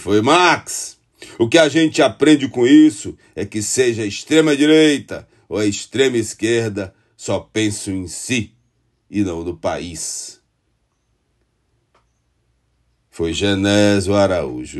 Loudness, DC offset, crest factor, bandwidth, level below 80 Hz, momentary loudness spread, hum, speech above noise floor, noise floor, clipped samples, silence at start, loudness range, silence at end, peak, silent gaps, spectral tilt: -16 LUFS; under 0.1%; 18 dB; 12.5 kHz; -50 dBFS; 16 LU; none; 50 dB; -66 dBFS; under 0.1%; 0 s; 13 LU; 0 s; 0 dBFS; none; -4.5 dB/octave